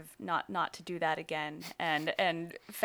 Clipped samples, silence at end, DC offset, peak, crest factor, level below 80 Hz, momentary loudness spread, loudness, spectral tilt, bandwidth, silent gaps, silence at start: under 0.1%; 0 s; under 0.1%; -14 dBFS; 22 dB; -78 dBFS; 8 LU; -34 LUFS; -4 dB/octave; over 20 kHz; none; 0 s